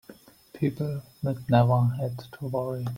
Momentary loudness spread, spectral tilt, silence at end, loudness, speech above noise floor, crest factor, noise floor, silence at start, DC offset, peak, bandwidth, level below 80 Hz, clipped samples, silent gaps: 11 LU; -9 dB/octave; 0 s; -27 LUFS; 26 dB; 20 dB; -52 dBFS; 0.1 s; under 0.1%; -6 dBFS; 16 kHz; -58 dBFS; under 0.1%; none